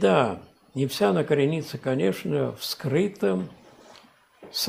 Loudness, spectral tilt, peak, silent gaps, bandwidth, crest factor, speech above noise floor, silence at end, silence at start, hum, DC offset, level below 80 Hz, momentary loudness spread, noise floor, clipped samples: -25 LUFS; -5.5 dB/octave; -6 dBFS; none; 15.5 kHz; 20 dB; 30 dB; 0 s; 0 s; none; under 0.1%; -66 dBFS; 10 LU; -54 dBFS; under 0.1%